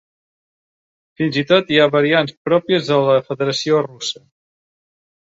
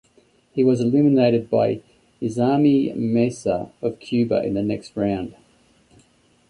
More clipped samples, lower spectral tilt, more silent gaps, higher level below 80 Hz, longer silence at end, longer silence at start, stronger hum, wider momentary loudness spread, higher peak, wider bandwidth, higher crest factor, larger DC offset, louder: neither; second, -5 dB/octave vs -8 dB/octave; first, 2.37-2.45 s vs none; second, -62 dBFS vs -56 dBFS; about the same, 1.1 s vs 1.2 s; first, 1.2 s vs 0.55 s; neither; about the same, 10 LU vs 12 LU; first, 0 dBFS vs -6 dBFS; second, 7.8 kHz vs 11 kHz; about the same, 18 dB vs 16 dB; neither; first, -17 LUFS vs -21 LUFS